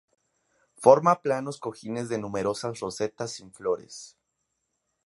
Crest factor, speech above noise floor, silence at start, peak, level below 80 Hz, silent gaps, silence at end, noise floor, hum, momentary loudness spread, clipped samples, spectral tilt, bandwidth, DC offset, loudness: 26 dB; 53 dB; 0.8 s; -2 dBFS; -66 dBFS; none; 1 s; -79 dBFS; none; 16 LU; under 0.1%; -5.5 dB/octave; 11.5 kHz; under 0.1%; -26 LUFS